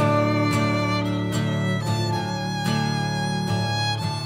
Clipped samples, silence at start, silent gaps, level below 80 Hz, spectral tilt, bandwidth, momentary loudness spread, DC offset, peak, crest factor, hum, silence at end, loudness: under 0.1%; 0 s; none; -50 dBFS; -5.5 dB/octave; 16 kHz; 4 LU; under 0.1%; -8 dBFS; 14 dB; none; 0 s; -23 LUFS